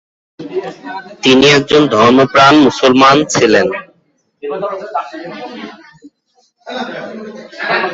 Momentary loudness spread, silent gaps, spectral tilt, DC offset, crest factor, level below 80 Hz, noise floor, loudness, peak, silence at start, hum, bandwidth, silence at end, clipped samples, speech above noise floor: 21 LU; none; -4 dB/octave; under 0.1%; 12 dB; -50 dBFS; -58 dBFS; -10 LUFS; 0 dBFS; 0.4 s; none; 8 kHz; 0 s; under 0.1%; 47 dB